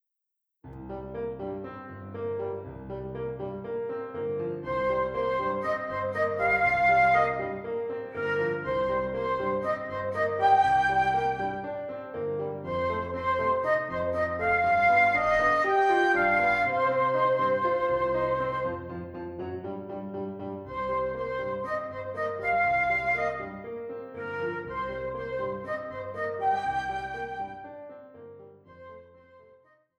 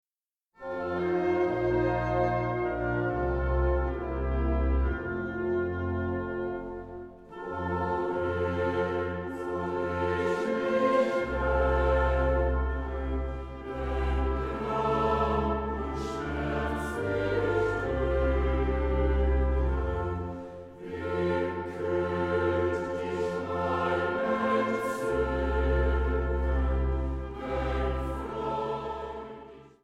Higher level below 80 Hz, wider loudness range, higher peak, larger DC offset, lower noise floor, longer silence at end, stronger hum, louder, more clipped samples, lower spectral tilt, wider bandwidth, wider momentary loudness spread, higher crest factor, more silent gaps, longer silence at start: second, -54 dBFS vs -34 dBFS; first, 11 LU vs 4 LU; about the same, -12 dBFS vs -14 dBFS; neither; second, -84 dBFS vs under -90 dBFS; first, 0.6 s vs 0.15 s; neither; about the same, -28 LUFS vs -29 LUFS; neither; second, -6.5 dB/octave vs -8 dB/octave; first, 11.5 kHz vs 8.8 kHz; first, 15 LU vs 9 LU; about the same, 16 dB vs 14 dB; neither; about the same, 0.65 s vs 0.6 s